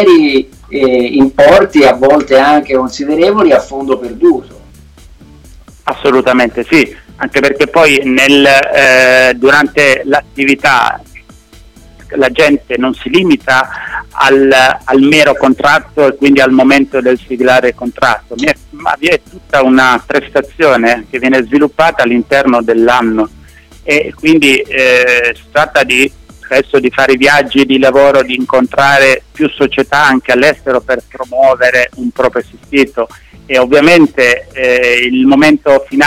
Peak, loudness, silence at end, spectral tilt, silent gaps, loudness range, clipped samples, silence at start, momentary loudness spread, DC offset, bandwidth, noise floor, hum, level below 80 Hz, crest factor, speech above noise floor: 0 dBFS; -8 LUFS; 0 s; -4 dB/octave; none; 5 LU; 0.1%; 0 s; 8 LU; 0.3%; 16 kHz; -38 dBFS; none; -38 dBFS; 8 dB; 29 dB